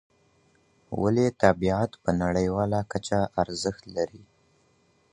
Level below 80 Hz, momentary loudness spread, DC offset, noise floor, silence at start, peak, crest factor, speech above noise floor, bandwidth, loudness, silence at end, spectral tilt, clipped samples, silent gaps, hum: -48 dBFS; 10 LU; under 0.1%; -65 dBFS; 0.9 s; -4 dBFS; 24 dB; 40 dB; 10.5 kHz; -26 LUFS; 0.95 s; -6 dB/octave; under 0.1%; none; none